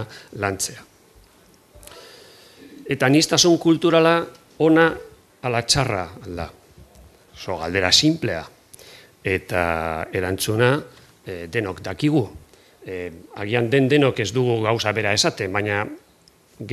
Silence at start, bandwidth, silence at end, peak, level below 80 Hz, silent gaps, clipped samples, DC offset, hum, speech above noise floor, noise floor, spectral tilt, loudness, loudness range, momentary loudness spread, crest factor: 0 s; 14.5 kHz; 0 s; 0 dBFS; -50 dBFS; none; under 0.1%; under 0.1%; none; 35 dB; -55 dBFS; -4 dB/octave; -20 LUFS; 6 LU; 18 LU; 22 dB